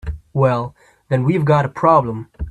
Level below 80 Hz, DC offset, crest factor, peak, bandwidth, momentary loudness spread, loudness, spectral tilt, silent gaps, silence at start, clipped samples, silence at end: -36 dBFS; under 0.1%; 18 dB; 0 dBFS; 8.6 kHz; 13 LU; -17 LUFS; -9 dB/octave; none; 0.05 s; under 0.1%; 0 s